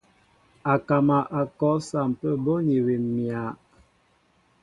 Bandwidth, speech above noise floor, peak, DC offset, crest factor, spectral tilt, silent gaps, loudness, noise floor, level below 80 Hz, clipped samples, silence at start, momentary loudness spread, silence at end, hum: 11 kHz; 41 dB; -6 dBFS; under 0.1%; 18 dB; -8.5 dB/octave; none; -25 LUFS; -64 dBFS; -62 dBFS; under 0.1%; 0.65 s; 10 LU; 1.1 s; none